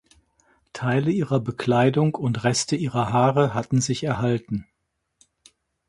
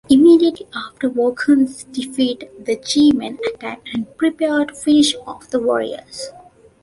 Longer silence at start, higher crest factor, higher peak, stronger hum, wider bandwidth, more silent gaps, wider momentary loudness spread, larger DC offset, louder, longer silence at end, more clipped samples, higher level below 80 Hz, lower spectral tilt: first, 0.75 s vs 0.1 s; about the same, 18 dB vs 16 dB; about the same, -4 dBFS vs -2 dBFS; neither; about the same, 11.5 kHz vs 11.5 kHz; neither; second, 7 LU vs 15 LU; neither; second, -23 LUFS vs -17 LUFS; first, 1.25 s vs 0.55 s; neither; about the same, -56 dBFS vs -54 dBFS; first, -5.5 dB/octave vs -3.5 dB/octave